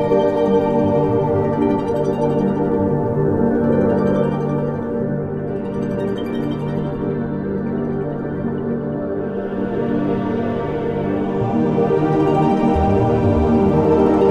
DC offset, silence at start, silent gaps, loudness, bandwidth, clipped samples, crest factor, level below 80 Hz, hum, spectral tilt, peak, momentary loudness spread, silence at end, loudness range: under 0.1%; 0 s; none; -19 LUFS; 8.4 kHz; under 0.1%; 14 dB; -36 dBFS; none; -9.5 dB/octave; -4 dBFS; 7 LU; 0 s; 6 LU